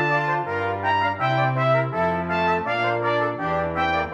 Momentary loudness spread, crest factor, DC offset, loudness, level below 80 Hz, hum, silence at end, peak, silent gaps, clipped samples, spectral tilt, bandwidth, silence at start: 3 LU; 14 dB; under 0.1%; -22 LUFS; -54 dBFS; none; 0 s; -8 dBFS; none; under 0.1%; -7 dB/octave; 7.8 kHz; 0 s